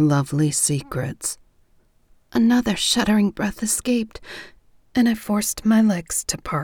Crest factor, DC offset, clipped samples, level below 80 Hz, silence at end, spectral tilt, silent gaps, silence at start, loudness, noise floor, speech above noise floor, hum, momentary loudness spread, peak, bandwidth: 18 dB; under 0.1%; under 0.1%; -48 dBFS; 0 s; -4 dB/octave; none; 0 s; -21 LUFS; -58 dBFS; 38 dB; none; 11 LU; -4 dBFS; 19.5 kHz